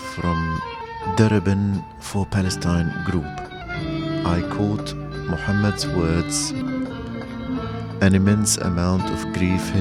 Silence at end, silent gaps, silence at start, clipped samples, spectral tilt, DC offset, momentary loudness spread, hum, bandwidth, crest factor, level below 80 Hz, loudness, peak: 0 s; none; 0 s; under 0.1%; -5.5 dB/octave; under 0.1%; 12 LU; none; 14.5 kHz; 18 dB; -38 dBFS; -22 LUFS; -4 dBFS